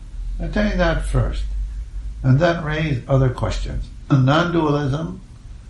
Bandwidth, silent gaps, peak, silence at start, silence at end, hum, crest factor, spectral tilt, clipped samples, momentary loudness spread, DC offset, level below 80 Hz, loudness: 11.5 kHz; none; -2 dBFS; 0 s; 0 s; none; 18 dB; -7.5 dB/octave; under 0.1%; 15 LU; under 0.1%; -28 dBFS; -20 LUFS